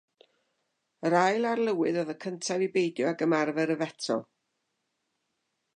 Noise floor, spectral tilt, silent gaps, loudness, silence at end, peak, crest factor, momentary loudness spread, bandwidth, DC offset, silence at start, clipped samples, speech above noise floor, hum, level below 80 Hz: -80 dBFS; -5 dB/octave; none; -28 LUFS; 1.55 s; -10 dBFS; 20 dB; 8 LU; 10.5 kHz; under 0.1%; 1 s; under 0.1%; 52 dB; none; -84 dBFS